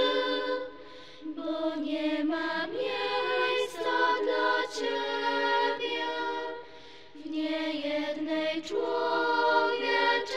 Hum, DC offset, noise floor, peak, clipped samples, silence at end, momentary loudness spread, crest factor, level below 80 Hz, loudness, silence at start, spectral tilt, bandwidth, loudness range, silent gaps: none; 0.3%; -50 dBFS; -14 dBFS; under 0.1%; 0 s; 13 LU; 16 dB; -70 dBFS; -29 LUFS; 0 s; -3 dB/octave; 13 kHz; 4 LU; none